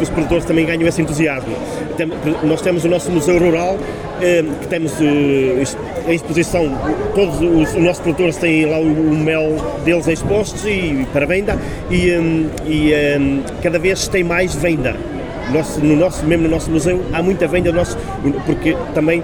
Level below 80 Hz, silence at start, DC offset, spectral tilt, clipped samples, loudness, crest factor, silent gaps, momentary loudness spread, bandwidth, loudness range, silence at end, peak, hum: -32 dBFS; 0 s; under 0.1%; -6 dB/octave; under 0.1%; -16 LUFS; 14 dB; none; 6 LU; 19 kHz; 2 LU; 0 s; -2 dBFS; none